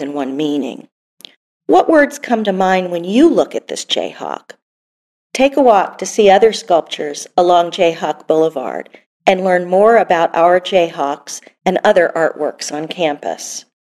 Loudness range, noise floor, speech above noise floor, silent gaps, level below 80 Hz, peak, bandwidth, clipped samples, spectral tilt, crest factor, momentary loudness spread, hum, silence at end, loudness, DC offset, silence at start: 3 LU; under -90 dBFS; over 76 dB; 0.92-1.17 s, 1.36-1.60 s, 4.62-5.30 s, 9.06-9.20 s; -56 dBFS; 0 dBFS; 13.5 kHz; under 0.1%; -4 dB/octave; 14 dB; 14 LU; none; 0.25 s; -14 LUFS; under 0.1%; 0 s